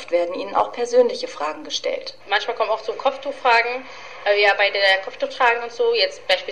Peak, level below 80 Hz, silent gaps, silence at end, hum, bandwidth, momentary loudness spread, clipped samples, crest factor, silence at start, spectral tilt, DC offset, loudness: -6 dBFS; -66 dBFS; none; 0 s; none; 10.5 kHz; 10 LU; under 0.1%; 16 dB; 0 s; -1 dB/octave; 0.6%; -20 LUFS